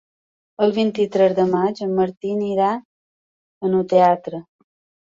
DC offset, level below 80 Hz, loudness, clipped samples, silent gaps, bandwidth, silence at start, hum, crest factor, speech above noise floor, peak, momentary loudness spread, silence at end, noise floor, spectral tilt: under 0.1%; -64 dBFS; -19 LUFS; under 0.1%; 2.17-2.21 s, 2.85-3.61 s; 7.6 kHz; 0.6 s; none; 18 dB; over 72 dB; -2 dBFS; 10 LU; 0.6 s; under -90 dBFS; -7.5 dB/octave